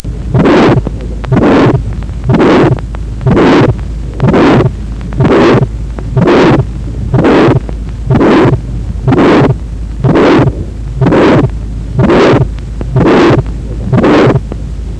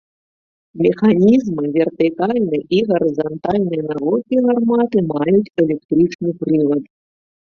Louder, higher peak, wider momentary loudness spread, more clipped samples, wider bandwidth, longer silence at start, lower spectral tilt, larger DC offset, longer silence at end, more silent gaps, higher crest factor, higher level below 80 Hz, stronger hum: first, -8 LUFS vs -17 LUFS; about the same, 0 dBFS vs -2 dBFS; first, 13 LU vs 6 LU; neither; first, 9 kHz vs 6.6 kHz; second, 0.05 s vs 0.75 s; about the same, -8 dB/octave vs -8.5 dB/octave; neither; second, 0 s vs 0.65 s; second, none vs 5.85-5.89 s, 6.15-6.19 s; second, 8 dB vs 14 dB; first, -20 dBFS vs -54 dBFS; neither